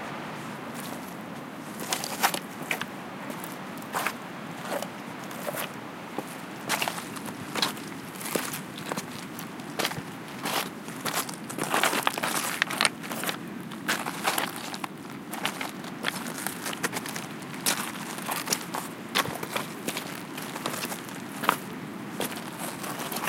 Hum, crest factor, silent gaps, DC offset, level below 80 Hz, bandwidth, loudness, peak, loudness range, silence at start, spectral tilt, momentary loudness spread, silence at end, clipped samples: none; 30 dB; none; under 0.1%; -72 dBFS; 17 kHz; -31 LUFS; -2 dBFS; 6 LU; 0 s; -2.5 dB/octave; 11 LU; 0 s; under 0.1%